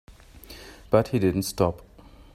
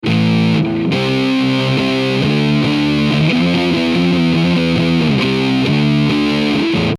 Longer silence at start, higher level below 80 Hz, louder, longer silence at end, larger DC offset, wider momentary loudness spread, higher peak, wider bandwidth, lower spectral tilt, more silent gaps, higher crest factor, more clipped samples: about the same, 0.1 s vs 0.05 s; second, -48 dBFS vs -40 dBFS; second, -24 LUFS vs -14 LUFS; first, 0.5 s vs 0 s; neither; first, 21 LU vs 2 LU; second, -6 dBFS vs -2 dBFS; first, 16 kHz vs 13 kHz; about the same, -6 dB/octave vs -6.5 dB/octave; neither; first, 22 dB vs 12 dB; neither